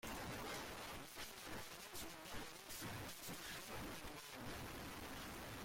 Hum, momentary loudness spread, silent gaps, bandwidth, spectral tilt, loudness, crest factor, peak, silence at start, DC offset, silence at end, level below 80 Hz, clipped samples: none; 3 LU; none; 16.5 kHz; -3 dB/octave; -51 LUFS; 14 dB; -38 dBFS; 0.05 s; under 0.1%; 0 s; -64 dBFS; under 0.1%